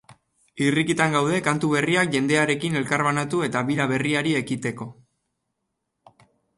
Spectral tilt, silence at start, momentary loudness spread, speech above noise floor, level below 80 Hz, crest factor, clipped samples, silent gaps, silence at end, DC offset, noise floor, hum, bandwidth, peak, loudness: -5 dB/octave; 0.1 s; 6 LU; 56 dB; -62 dBFS; 18 dB; under 0.1%; none; 1.65 s; under 0.1%; -79 dBFS; none; 11.5 kHz; -6 dBFS; -22 LUFS